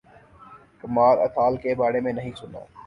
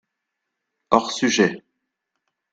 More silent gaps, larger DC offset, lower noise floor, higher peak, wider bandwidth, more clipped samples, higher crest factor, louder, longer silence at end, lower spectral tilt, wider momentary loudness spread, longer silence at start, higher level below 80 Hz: neither; neither; second, -50 dBFS vs -80 dBFS; second, -6 dBFS vs 0 dBFS; about the same, 10 kHz vs 9.2 kHz; neither; second, 18 dB vs 24 dB; about the same, -22 LUFS vs -20 LUFS; second, 0.05 s vs 0.95 s; first, -8 dB/octave vs -3.5 dB/octave; first, 21 LU vs 5 LU; second, 0.5 s vs 0.9 s; first, -56 dBFS vs -62 dBFS